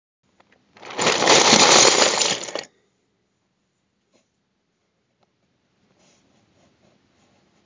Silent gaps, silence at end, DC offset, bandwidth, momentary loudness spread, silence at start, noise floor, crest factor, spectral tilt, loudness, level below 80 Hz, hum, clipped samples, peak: none; 5 s; under 0.1%; 7.8 kHz; 20 LU; 0.85 s; -71 dBFS; 22 dB; -0.5 dB/octave; -14 LUFS; -64 dBFS; none; under 0.1%; 0 dBFS